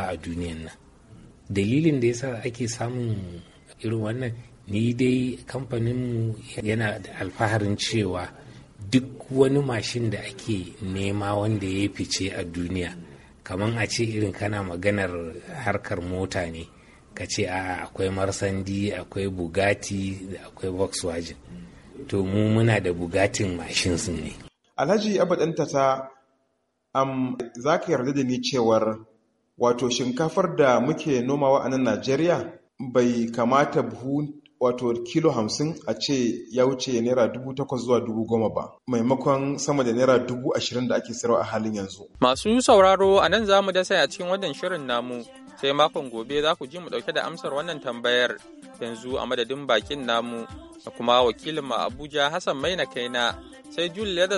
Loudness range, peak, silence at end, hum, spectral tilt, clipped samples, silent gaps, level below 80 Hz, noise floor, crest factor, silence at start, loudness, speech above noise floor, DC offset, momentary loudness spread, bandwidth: 7 LU; -4 dBFS; 0 s; none; -5 dB/octave; under 0.1%; none; -52 dBFS; -73 dBFS; 22 dB; 0 s; -25 LUFS; 49 dB; under 0.1%; 13 LU; 11.5 kHz